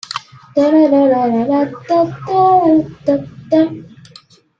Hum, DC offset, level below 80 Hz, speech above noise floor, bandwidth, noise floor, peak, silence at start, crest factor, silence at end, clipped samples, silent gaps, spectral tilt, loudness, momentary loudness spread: none; under 0.1%; -54 dBFS; 31 dB; 7.8 kHz; -44 dBFS; -2 dBFS; 0.1 s; 12 dB; 0.75 s; under 0.1%; none; -7 dB/octave; -14 LUFS; 10 LU